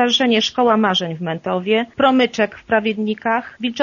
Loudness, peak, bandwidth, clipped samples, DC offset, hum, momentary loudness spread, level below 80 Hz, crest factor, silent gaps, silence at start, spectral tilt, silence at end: -18 LUFS; -2 dBFS; 7.2 kHz; under 0.1%; under 0.1%; none; 7 LU; -58 dBFS; 16 dB; none; 0 s; -2.5 dB/octave; 0 s